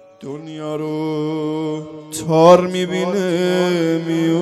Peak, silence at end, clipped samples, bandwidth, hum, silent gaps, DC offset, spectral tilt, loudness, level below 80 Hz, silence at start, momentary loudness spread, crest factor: 0 dBFS; 0 s; under 0.1%; 14 kHz; none; none; under 0.1%; -6 dB/octave; -17 LUFS; -62 dBFS; 0.2 s; 18 LU; 18 dB